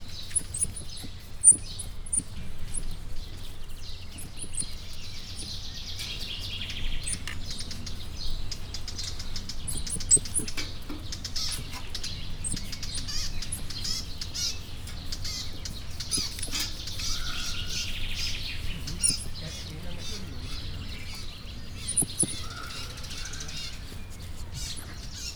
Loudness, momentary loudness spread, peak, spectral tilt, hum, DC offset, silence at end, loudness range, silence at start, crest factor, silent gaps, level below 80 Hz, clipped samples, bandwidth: -30 LUFS; 15 LU; -6 dBFS; -1.5 dB/octave; none; under 0.1%; 0 s; 10 LU; 0 s; 24 dB; none; -38 dBFS; under 0.1%; over 20 kHz